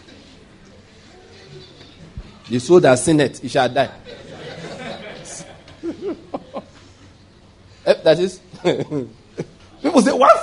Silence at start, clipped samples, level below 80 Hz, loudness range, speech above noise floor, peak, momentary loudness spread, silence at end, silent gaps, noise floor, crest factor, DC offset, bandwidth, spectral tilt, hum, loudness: 1.5 s; under 0.1%; -50 dBFS; 14 LU; 32 dB; 0 dBFS; 25 LU; 0 s; none; -48 dBFS; 20 dB; under 0.1%; 11 kHz; -5 dB/octave; none; -17 LUFS